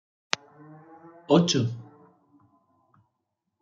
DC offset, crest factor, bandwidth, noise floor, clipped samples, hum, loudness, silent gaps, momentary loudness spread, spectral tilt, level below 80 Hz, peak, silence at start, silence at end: under 0.1%; 30 dB; 7.6 kHz; -81 dBFS; under 0.1%; none; -25 LUFS; none; 19 LU; -5 dB/octave; -72 dBFS; 0 dBFS; 1.3 s; 1.8 s